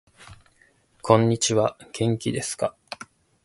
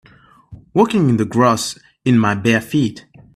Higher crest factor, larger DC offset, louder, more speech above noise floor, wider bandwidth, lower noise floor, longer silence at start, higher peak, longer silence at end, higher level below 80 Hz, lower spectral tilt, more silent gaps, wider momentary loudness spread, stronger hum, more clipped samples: first, 24 dB vs 16 dB; neither; second, -23 LUFS vs -16 LUFS; first, 39 dB vs 31 dB; second, 11.5 kHz vs 14 kHz; first, -61 dBFS vs -46 dBFS; second, 0.2 s vs 0.5 s; about the same, 0 dBFS vs 0 dBFS; about the same, 0.4 s vs 0.35 s; about the same, -58 dBFS vs -54 dBFS; about the same, -5 dB/octave vs -6 dB/octave; neither; first, 20 LU vs 8 LU; neither; neither